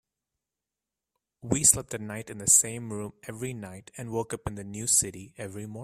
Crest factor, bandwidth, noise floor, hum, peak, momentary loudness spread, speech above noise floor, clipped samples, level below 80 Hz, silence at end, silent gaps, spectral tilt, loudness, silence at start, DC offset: 26 dB; 16 kHz; -89 dBFS; none; -6 dBFS; 20 LU; 60 dB; under 0.1%; -56 dBFS; 0 s; none; -3 dB/octave; -25 LUFS; 1.45 s; under 0.1%